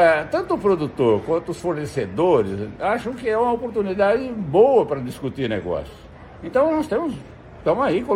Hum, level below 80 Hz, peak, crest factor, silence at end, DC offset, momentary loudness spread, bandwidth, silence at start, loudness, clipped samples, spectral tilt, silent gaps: none; -48 dBFS; -4 dBFS; 18 dB; 0 s; under 0.1%; 10 LU; 13.5 kHz; 0 s; -21 LUFS; under 0.1%; -7 dB/octave; none